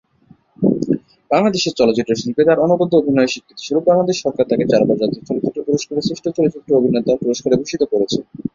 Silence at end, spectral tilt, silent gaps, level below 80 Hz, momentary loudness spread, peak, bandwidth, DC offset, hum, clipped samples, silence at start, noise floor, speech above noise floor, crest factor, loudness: 0.05 s; -5.5 dB/octave; none; -54 dBFS; 7 LU; -2 dBFS; 7.6 kHz; under 0.1%; none; under 0.1%; 0.6 s; -51 dBFS; 35 dB; 16 dB; -17 LUFS